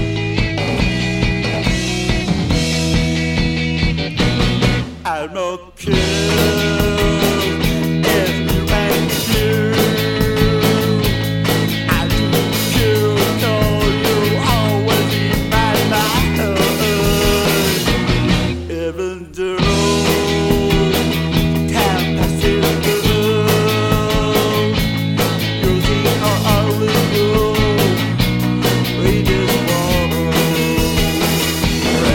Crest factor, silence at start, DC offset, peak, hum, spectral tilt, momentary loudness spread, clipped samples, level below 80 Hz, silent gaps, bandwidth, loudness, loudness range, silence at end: 14 dB; 0 s; under 0.1%; 0 dBFS; none; -5 dB/octave; 3 LU; under 0.1%; -26 dBFS; none; 17.5 kHz; -16 LUFS; 2 LU; 0 s